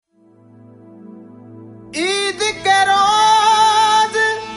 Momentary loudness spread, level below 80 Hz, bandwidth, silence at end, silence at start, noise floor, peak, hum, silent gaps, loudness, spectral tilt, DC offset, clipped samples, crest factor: 7 LU; -56 dBFS; 11.5 kHz; 0 s; 1.05 s; -49 dBFS; -4 dBFS; none; none; -14 LUFS; -1 dB/octave; under 0.1%; under 0.1%; 14 dB